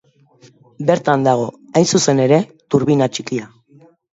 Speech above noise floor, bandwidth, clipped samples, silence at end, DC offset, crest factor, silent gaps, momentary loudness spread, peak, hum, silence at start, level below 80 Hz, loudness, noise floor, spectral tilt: 35 dB; 8.2 kHz; under 0.1%; 0.65 s; under 0.1%; 16 dB; none; 8 LU; 0 dBFS; none; 0.8 s; -60 dBFS; -16 LUFS; -50 dBFS; -5 dB/octave